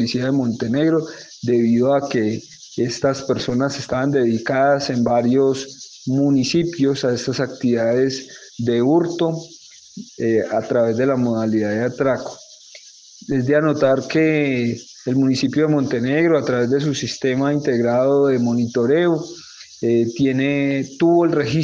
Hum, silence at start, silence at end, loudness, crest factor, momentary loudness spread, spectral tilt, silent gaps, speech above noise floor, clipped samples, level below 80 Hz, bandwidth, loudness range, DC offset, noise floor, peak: none; 0 s; 0 s; -19 LUFS; 14 dB; 9 LU; -6 dB/octave; none; 25 dB; under 0.1%; -58 dBFS; 7.8 kHz; 3 LU; under 0.1%; -43 dBFS; -4 dBFS